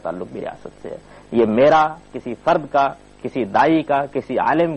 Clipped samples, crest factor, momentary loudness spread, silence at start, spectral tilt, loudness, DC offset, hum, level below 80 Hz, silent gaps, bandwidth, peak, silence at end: under 0.1%; 14 dB; 19 LU; 0.05 s; -7 dB/octave; -18 LUFS; under 0.1%; none; -52 dBFS; none; 8.6 kHz; -6 dBFS; 0 s